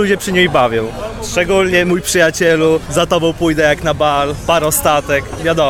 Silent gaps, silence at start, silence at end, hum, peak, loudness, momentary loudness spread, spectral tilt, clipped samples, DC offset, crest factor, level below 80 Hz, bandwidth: none; 0 s; 0 s; none; 0 dBFS; -13 LUFS; 6 LU; -4 dB/octave; under 0.1%; under 0.1%; 14 dB; -34 dBFS; 17.5 kHz